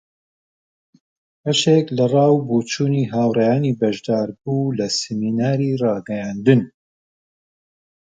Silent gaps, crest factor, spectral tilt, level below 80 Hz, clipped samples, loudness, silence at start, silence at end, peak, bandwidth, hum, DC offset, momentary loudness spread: none; 20 dB; -6 dB/octave; -62 dBFS; under 0.1%; -19 LUFS; 1.45 s; 1.5 s; 0 dBFS; 9.4 kHz; none; under 0.1%; 7 LU